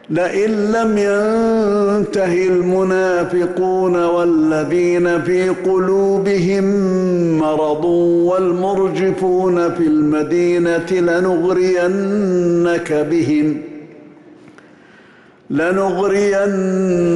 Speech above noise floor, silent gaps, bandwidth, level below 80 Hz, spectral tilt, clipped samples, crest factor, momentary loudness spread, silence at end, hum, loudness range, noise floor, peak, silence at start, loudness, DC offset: 31 dB; none; 11.5 kHz; -50 dBFS; -7 dB/octave; under 0.1%; 8 dB; 2 LU; 0 s; none; 4 LU; -46 dBFS; -8 dBFS; 0.1 s; -15 LUFS; under 0.1%